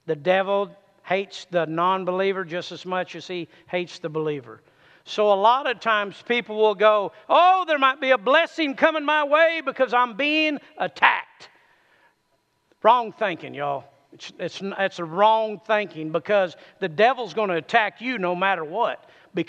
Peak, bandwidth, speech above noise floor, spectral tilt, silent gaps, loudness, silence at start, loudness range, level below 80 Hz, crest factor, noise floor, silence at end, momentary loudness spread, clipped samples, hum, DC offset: 0 dBFS; 8.4 kHz; 47 dB; -5 dB/octave; none; -22 LUFS; 0.05 s; 7 LU; -80 dBFS; 22 dB; -69 dBFS; 0.05 s; 12 LU; under 0.1%; none; under 0.1%